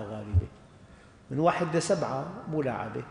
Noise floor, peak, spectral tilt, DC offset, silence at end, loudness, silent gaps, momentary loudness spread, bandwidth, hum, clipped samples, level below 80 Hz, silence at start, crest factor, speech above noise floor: -53 dBFS; -10 dBFS; -6 dB/octave; under 0.1%; 0 s; -30 LUFS; none; 9 LU; 10.5 kHz; none; under 0.1%; -46 dBFS; 0 s; 20 dB; 24 dB